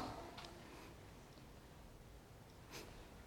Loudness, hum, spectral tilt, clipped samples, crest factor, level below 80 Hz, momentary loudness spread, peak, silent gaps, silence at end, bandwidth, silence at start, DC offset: -57 LUFS; none; -4.5 dB/octave; under 0.1%; 20 dB; -64 dBFS; 8 LU; -34 dBFS; none; 0 s; 19 kHz; 0 s; under 0.1%